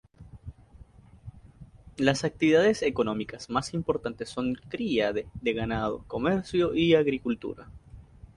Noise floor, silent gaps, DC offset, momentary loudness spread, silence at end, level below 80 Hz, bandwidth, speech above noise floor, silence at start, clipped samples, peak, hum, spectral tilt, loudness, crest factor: -52 dBFS; none; under 0.1%; 15 LU; 0.35 s; -52 dBFS; 11 kHz; 25 dB; 0.2 s; under 0.1%; -8 dBFS; none; -5.5 dB/octave; -27 LUFS; 20 dB